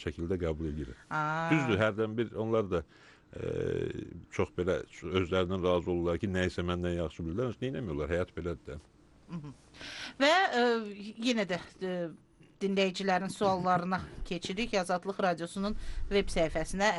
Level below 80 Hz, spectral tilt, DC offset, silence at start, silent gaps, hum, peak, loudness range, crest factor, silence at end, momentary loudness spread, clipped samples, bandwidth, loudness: -48 dBFS; -5.5 dB/octave; under 0.1%; 0 s; none; none; -14 dBFS; 3 LU; 18 dB; 0 s; 13 LU; under 0.1%; 11.5 kHz; -32 LUFS